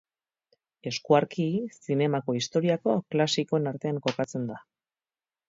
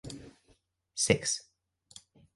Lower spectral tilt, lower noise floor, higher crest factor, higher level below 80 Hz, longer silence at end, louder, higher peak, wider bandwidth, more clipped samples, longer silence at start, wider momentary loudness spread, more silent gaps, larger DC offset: first, -5.5 dB/octave vs -3 dB/octave; first, under -90 dBFS vs -69 dBFS; second, 22 dB vs 28 dB; second, -72 dBFS vs -60 dBFS; about the same, 0.9 s vs 0.95 s; first, -27 LUFS vs -30 LUFS; about the same, -8 dBFS vs -8 dBFS; second, 7.8 kHz vs 11.5 kHz; neither; first, 0.85 s vs 0.05 s; second, 10 LU vs 26 LU; neither; neither